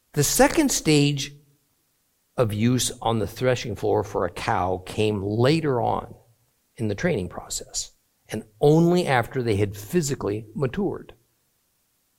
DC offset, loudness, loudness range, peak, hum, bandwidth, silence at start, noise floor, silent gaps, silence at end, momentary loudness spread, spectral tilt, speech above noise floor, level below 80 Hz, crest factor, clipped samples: under 0.1%; -23 LUFS; 3 LU; -4 dBFS; none; 17 kHz; 0.15 s; -69 dBFS; none; 1.15 s; 12 LU; -5 dB/octave; 46 dB; -48 dBFS; 20 dB; under 0.1%